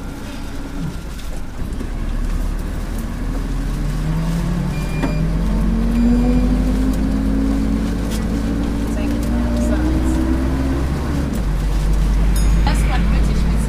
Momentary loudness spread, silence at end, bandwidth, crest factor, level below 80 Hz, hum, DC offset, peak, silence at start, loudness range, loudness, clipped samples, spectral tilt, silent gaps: 10 LU; 0 s; 15 kHz; 14 dB; -20 dBFS; none; under 0.1%; -4 dBFS; 0 s; 7 LU; -20 LUFS; under 0.1%; -7 dB/octave; none